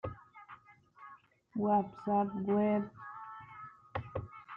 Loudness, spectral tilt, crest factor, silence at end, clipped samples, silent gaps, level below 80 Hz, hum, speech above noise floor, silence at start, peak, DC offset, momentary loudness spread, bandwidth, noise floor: -35 LUFS; -10 dB/octave; 18 dB; 0 s; under 0.1%; none; -66 dBFS; none; 28 dB; 0.05 s; -18 dBFS; under 0.1%; 23 LU; 4.1 kHz; -59 dBFS